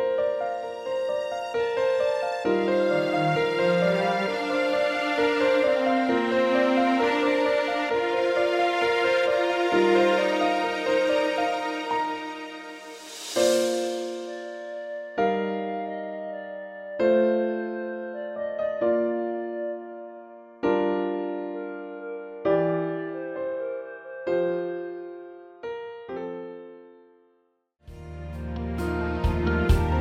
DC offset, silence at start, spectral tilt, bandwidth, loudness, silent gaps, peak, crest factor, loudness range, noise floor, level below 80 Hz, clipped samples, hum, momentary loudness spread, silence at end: under 0.1%; 0 s; -5.5 dB/octave; 15.5 kHz; -25 LUFS; none; -8 dBFS; 16 dB; 10 LU; -68 dBFS; -40 dBFS; under 0.1%; none; 15 LU; 0 s